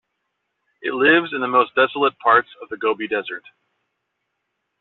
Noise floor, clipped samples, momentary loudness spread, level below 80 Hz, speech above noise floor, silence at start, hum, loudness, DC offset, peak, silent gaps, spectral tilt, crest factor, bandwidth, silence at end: -76 dBFS; under 0.1%; 15 LU; -64 dBFS; 57 dB; 0.85 s; none; -18 LUFS; under 0.1%; -4 dBFS; none; -1 dB/octave; 18 dB; 4.3 kHz; 1.4 s